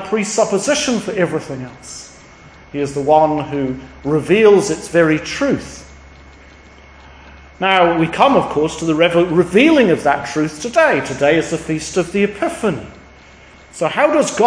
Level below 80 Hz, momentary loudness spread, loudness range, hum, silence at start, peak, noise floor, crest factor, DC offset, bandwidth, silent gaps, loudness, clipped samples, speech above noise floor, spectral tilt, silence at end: -46 dBFS; 13 LU; 5 LU; none; 0 s; 0 dBFS; -42 dBFS; 16 dB; under 0.1%; 10.5 kHz; none; -15 LUFS; under 0.1%; 27 dB; -4.5 dB/octave; 0 s